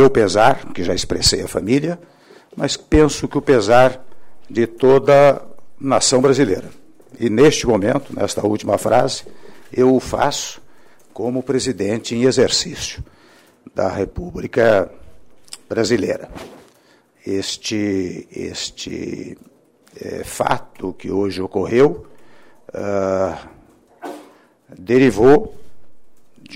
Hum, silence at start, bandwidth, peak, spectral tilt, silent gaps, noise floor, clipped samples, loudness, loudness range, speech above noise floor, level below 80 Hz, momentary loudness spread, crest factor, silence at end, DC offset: none; 0 s; 16 kHz; -2 dBFS; -4.5 dB/octave; none; -54 dBFS; under 0.1%; -17 LUFS; 10 LU; 37 dB; -42 dBFS; 18 LU; 16 dB; 0 s; under 0.1%